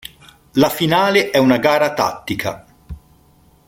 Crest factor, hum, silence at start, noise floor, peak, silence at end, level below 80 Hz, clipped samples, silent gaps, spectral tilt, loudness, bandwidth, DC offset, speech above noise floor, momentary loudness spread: 16 dB; none; 0.55 s; -52 dBFS; 0 dBFS; 0.7 s; -46 dBFS; under 0.1%; none; -5 dB/octave; -16 LUFS; 16.5 kHz; under 0.1%; 36 dB; 12 LU